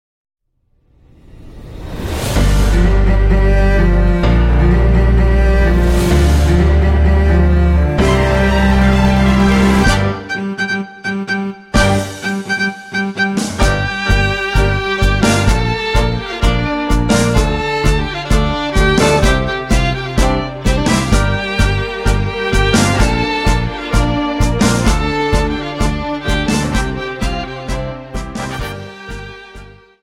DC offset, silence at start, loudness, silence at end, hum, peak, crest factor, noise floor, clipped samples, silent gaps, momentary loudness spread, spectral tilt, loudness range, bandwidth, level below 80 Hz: under 0.1%; 1.35 s; -14 LUFS; 0.35 s; none; 0 dBFS; 14 dB; -59 dBFS; under 0.1%; none; 9 LU; -5.5 dB/octave; 6 LU; 15 kHz; -16 dBFS